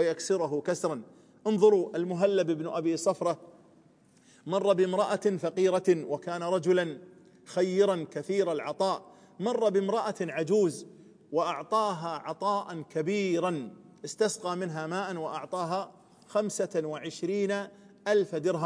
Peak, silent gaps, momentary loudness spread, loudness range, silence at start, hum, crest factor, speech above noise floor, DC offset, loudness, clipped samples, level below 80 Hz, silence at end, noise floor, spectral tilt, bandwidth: -10 dBFS; none; 10 LU; 4 LU; 0 s; none; 20 dB; 32 dB; under 0.1%; -29 LUFS; under 0.1%; -84 dBFS; 0 s; -61 dBFS; -5.5 dB/octave; 10.5 kHz